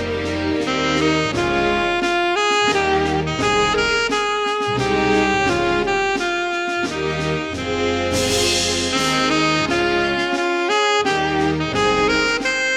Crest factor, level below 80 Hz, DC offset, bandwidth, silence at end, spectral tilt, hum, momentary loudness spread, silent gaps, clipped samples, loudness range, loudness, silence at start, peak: 16 dB; -40 dBFS; under 0.1%; 15.5 kHz; 0 s; -3.5 dB/octave; none; 5 LU; none; under 0.1%; 2 LU; -18 LUFS; 0 s; -4 dBFS